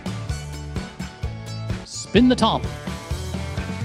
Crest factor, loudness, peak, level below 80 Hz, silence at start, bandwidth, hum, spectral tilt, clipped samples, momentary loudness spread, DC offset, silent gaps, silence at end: 22 dB; -24 LUFS; -2 dBFS; -36 dBFS; 0 s; 14 kHz; none; -5.5 dB/octave; under 0.1%; 15 LU; under 0.1%; none; 0 s